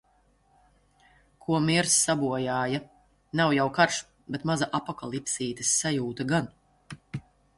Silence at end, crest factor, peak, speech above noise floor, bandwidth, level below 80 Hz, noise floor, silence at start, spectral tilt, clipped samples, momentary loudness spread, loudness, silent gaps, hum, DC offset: 0.4 s; 22 dB; -8 dBFS; 39 dB; 12 kHz; -62 dBFS; -65 dBFS; 1.5 s; -3.5 dB/octave; under 0.1%; 18 LU; -26 LUFS; none; none; under 0.1%